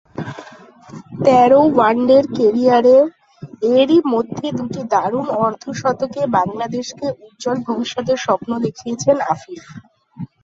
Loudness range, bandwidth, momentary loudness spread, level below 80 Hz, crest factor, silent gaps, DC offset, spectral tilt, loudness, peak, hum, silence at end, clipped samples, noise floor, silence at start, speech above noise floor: 7 LU; 7.8 kHz; 15 LU; -58 dBFS; 16 dB; none; under 0.1%; -6 dB/octave; -16 LUFS; 0 dBFS; none; 0.2 s; under 0.1%; -41 dBFS; 0.2 s; 26 dB